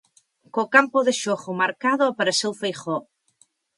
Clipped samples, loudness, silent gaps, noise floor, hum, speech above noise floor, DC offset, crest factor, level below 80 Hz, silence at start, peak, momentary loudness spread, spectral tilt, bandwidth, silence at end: under 0.1%; -22 LUFS; none; -63 dBFS; none; 41 dB; under 0.1%; 20 dB; -76 dBFS; 0.55 s; -2 dBFS; 12 LU; -3 dB/octave; 11.5 kHz; 0.75 s